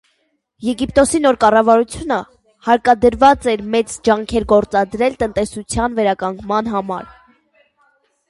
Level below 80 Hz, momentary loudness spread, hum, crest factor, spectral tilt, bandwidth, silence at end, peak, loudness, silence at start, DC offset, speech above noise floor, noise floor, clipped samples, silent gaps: -40 dBFS; 10 LU; none; 16 dB; -4.5 dB/octave; 11.5 kHz; 1.25 s; 0 dBFS; -16 LUFS; 0.6 s; under 0.1%; 50 dB; -65 dBFS; under 0.1%; none